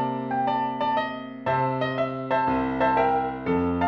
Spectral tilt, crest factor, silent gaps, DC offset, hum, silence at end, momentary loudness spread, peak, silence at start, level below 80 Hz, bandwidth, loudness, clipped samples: -8.5 dB/octave; 14 dB; none; under 0.1%; none; 0 s; 5 LU; -10 dBFS; 0 s; -50 dBFS; 6.2 kHz; -25 LUFS; under 0.1%